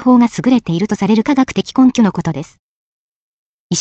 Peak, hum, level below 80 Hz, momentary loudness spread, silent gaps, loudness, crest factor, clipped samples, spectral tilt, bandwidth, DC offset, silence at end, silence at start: -2 dBFS; none; -50 dBFS; 10 LU; 2.59-3.70 s; -14 LUFS; 14 dB; under 0.1%; -5.5 dB/octave; 8.2 kHz; under 0.1%; 0 s; 0 s